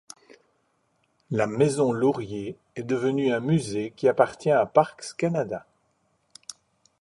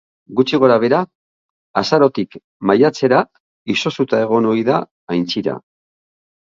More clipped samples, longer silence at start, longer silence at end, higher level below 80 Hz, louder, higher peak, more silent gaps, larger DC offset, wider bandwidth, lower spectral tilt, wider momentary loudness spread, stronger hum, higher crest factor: neither; first, 1.3 s vs 0.3 s; second, 0.5 s vs 1 s; about the same, -64 dBFS vs -60 dBFS; second, -25 LUFS vs -16 LUFS; second, -4 dBFS vs 0 dBFS; second, none vs 1.15-1.74 s, 2.44-2.60 s, 3.40-3.65 s, 4.91-5.07 s; neither; first, 11.5 kHz vs 7.6 kHz; about the same, -6.5 dB/octave vs -6 dB/octave; first, 15 LU vs 12 LU; neither; about the same, 22 dB vs 18 dB